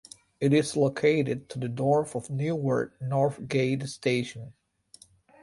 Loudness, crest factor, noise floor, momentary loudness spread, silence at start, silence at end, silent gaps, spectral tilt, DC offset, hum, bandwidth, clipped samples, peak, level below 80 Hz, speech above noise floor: -27 LUFS; 18 dB; -57 dBFS; 9 LU; 0.4 s; 0.9 s; none; -6.5 dB/octave; under 0.1%; none; 11.5 kHz; under 0.1%; -10 dBFS; -64 dBFS; 30 dB